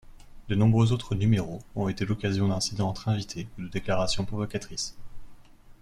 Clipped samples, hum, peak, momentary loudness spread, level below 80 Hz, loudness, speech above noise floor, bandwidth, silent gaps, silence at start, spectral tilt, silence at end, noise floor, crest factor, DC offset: under 0.1%; none; -10 dBFS; 11 LU; -46 dBFS; -28 LUFS; 22 dB; 11.5 kHz; none; 0.05 s; -6 dB/octave; 0.1 s; -48 dBFS; 18 dB; under 0.1%